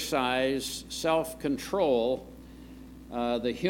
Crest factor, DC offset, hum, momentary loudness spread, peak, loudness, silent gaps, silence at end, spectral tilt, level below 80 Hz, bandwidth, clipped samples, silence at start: 18 dB; under 0.1%; none; 21 LU; -12 dBFS; -29 LUFS; none; 0 s; -4 dB/octave; -52 dBFS; 18 kHz; under 0.1%; 0 s